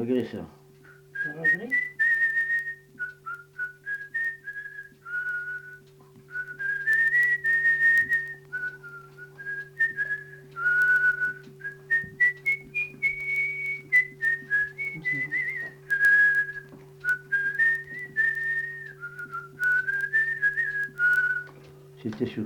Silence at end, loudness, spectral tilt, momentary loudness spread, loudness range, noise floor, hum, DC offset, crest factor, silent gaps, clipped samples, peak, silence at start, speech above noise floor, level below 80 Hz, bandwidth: 0 s; -25 LUFS; -5 dB/octave; 17 LU; 5 LU; -53 dBFS; none; under 0.1%; 14 dB; none; under 0.1%; -12 dBFS; 0 s; 25 dB; -68 dBFS; 19 kHz